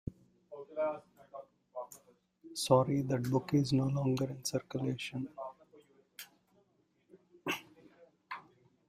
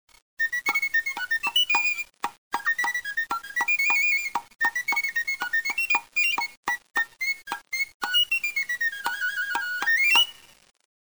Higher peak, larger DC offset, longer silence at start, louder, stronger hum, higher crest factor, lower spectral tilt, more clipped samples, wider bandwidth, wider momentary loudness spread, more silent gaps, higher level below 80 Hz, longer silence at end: second, -14 dBFS vs -8 dBFS; second, under 0.1% vs 0.1%; second, 0.05 s vs 0.4 s; second, -34 LUFS vs -24 LUFS; neither; first, 24 dB vs 18 dB; first, -6 dB/octave vs 2 dB/octave; neither; second, 15.5 kHz vs over 20 kHz; first, 22 LU vs 9 LU; second, none vs 2.38-2.51 s, 6.57-6.63 s, 7.94-8.00 s; about the same, -66 dBFS vs -68 dBFS; second, 0.45 s vs 0.7 s